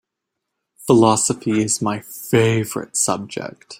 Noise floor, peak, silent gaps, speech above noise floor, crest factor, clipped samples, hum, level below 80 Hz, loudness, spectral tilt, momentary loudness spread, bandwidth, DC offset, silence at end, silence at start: -80 dBFS; -2 dBFS; none; 62 dB; 18 dB; under 0.1%; none; -56 dBFS; -18 LUFS; -4.5 dB/octave; 14 LU; 16.5 kHz; under 0.1%; 0.05 s; 0.8 s